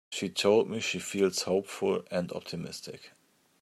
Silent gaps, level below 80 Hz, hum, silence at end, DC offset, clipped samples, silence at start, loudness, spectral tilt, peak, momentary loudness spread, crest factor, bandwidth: none; -74 dBFS; none; 0.55 s; under 0.1%; under 0.1%; 0.1 s; -30 LUFS; -4 dB/octave; -12 dBFS; 15 LU; 18 dB; 15.5 kHz